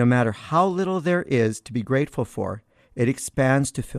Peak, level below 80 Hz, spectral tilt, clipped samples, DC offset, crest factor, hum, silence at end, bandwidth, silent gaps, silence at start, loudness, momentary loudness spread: -6 dBFS; -52 dBFS; -6.5 dB/octave; under 0.1%; under 0.1%; 16 dB; none; 0 s; 14 kHz; none; 0 s; -23 LUFS; 10 LU